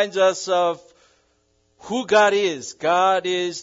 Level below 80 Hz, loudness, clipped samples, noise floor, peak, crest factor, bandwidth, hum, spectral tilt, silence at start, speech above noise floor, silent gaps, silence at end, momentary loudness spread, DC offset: -68 dBFS; -20 LUFS; under 0.1%; -65 dBFS; -4 dBFS; 18 dB; 8 kHz; none; -3 dB/octave; 0 s; 45 dB; none; 0 s; 10 LU; under 0.1%